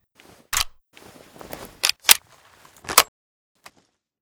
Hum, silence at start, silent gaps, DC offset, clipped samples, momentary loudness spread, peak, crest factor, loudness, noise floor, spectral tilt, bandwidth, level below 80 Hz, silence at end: none; 0.55 s; none; under 0.1%; under 0.1%; 23 LU; 0 dBFS; 26 dB; -19 LUFS; -65 dBFS; 1 dB/octave; over 20 kHz; -50 dBFS; 1.15 s